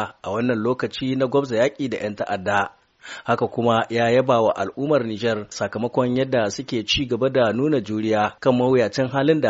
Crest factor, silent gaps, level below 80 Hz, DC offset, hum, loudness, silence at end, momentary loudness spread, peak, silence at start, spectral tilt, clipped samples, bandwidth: 18 dB; none; -52 dBFS; under 0.1%; none; -21 LUFS; 0 s; 7 LU; -4 dBFS; 0 s; -4.5 dB/octave; under 0.1%; 8 kHz